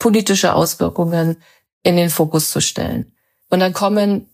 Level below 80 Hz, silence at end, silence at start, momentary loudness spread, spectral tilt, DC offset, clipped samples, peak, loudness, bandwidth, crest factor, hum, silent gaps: -48 dBFS; 0.1 s; 0 s; 9 LU; -4.5 dB/octave; under 0.1%; under 0.1%; -2 dBFS; -16 LUFS; 15.5 kHz; 16 dB; none; 1.72-1.81 s